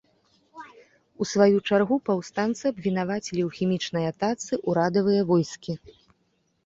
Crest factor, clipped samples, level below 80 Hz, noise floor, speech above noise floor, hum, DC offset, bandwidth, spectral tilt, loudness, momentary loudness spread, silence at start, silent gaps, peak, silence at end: 20 dB; under 0.1%; -64 dBFS; -70 dBFS; 46 dB; none; under 0.1%; 7.8 kHz; -6 dB/octave; -25 LUFS; 14 LU; 0.55 s; none; -6 dBFS; 0.9 s